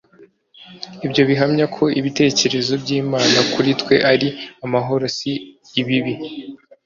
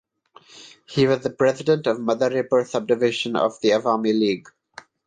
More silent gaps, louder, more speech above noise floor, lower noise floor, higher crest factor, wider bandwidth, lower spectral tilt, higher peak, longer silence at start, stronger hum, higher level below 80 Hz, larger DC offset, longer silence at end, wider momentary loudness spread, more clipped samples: neither; first, -18 LUFS vs -21 LUFS; about the same, 32 dB vs 32 dB; about the same, -50 dBFS vs -53 dBFS; about the same, 18 dB vs 16 dB; second, 7.6 kHz vs 9.6 kHz; about the same, -4.5 dB/octave vs -5.5 dB/octave; first, 0 dBFS vs -6 dBFS; second, 0.2 s vs 0.55 s; neither; first, -56 dBFS vs -64 dBFS; neither; second, 0.3 s vs 0.7 s; first, 14 LU vs 3 LU; neither